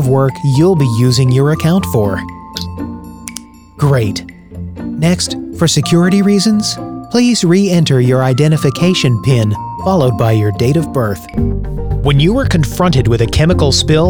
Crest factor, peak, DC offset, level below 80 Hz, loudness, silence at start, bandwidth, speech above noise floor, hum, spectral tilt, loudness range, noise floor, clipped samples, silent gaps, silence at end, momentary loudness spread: 12 dB; 0 dBFS; under 0.1%; -28 dBFS; -12 LUFS; 0 s; 18 kHz; 21 dB; none; -6 dB/octave; 6 LU; -32 dBFS; under 0.1%; none; 0 s; 13 LU